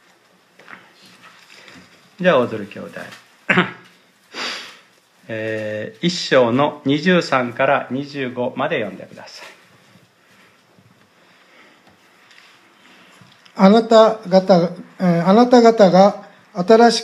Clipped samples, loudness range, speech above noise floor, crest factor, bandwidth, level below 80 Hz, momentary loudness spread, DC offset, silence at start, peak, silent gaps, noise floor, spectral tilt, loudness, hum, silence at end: under 0.1%; 11 LU; 39 dB; 18 dB; 11.5 kHz; -70 dBFS; 24 LU; under 0.1%; 2.2 s; 0 dBFS; none; -54 dBFS; -6 dB/octave; -16 LUFS; none; 0 s